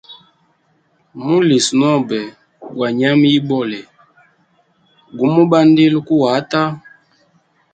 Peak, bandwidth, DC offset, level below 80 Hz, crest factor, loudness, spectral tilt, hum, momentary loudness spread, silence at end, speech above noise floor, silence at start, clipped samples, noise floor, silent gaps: 0 dBFS; 9.4 kHz; under 0.1%; -60 dBFS; 16 dB; -14 LUFS; -5.5 dB/octave; none; 17 LU; 0.95 s; 46 dB; 0.1 s; under 0.1%; -59 dBFS; none